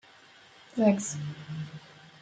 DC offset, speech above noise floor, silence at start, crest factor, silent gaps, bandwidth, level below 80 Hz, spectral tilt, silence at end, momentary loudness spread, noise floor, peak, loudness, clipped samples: under 0.1%; 27 dB; 0.75 s; 22 dB; none; 9.4 kHz; -72 dBFS; -6 dB/octave; 0.15 s; 20 LU; -56 dBFS; -10 dBFS; -30 LUFS; under 0.1%